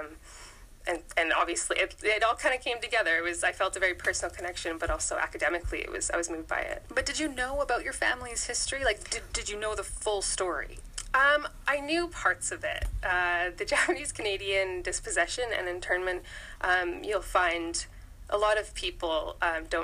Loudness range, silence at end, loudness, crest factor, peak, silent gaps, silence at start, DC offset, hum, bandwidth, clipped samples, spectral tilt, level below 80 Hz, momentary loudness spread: 3 LU; 0 s; -29 LUFS; 18 dB; -12 dBFS; none; 0 s; under 0.1%; none; 15.5 kHz; under 0.1%; -2 dB/octave; -46 dBFS; 8 LU